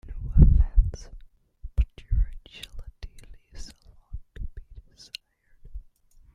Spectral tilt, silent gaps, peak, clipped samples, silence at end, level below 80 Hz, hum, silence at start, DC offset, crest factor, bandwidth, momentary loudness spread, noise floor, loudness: -7.5 dB/octave; none; -2 dBFS; under 0.1%; 0.55 s; -28 dBFS; none; 0.1 s; under 0.1%; 24 dB; 7.6 kHz; 28 LU; -55 dBFS; -25 LUFS